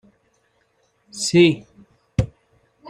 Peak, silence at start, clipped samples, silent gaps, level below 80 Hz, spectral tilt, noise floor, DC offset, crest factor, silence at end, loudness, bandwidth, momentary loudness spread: -4 dBFS; 1.15 s; under 0.1%; none; -44 dBFS; -5 dB/octave; -65 dBFS; under 0.1%; 20 dB; 0 s; -20 LUFS; 11.5 kHz; 16 LU